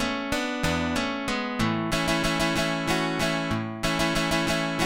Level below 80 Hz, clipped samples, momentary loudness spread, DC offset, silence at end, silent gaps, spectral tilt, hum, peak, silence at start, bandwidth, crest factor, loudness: -42 dBFS; under 0.1%; 4 LU; 0.2%; 0 s; none; -4 dB/octave; none; -8 dBFS; 0 s; 17 kHz; 18 dB; -26 LUFS